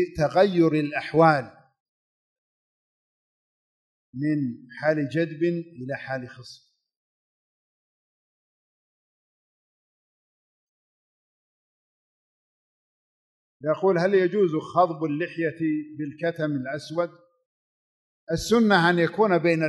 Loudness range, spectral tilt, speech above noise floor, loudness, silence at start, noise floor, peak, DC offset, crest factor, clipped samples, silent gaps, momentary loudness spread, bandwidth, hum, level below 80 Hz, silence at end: 11 LU; -6.5 dB/octave; over 67 dB; -24 LUFS; 0 s; under -90 dBFS; -4 dBFS; under 0.1%; 22 dB; under 0.1%; 1.80-4.13 s, 6.97-13.60 s, 17.46-18.27 s; 14 LU; 12 kHz; none; -58 dBFS; 0 s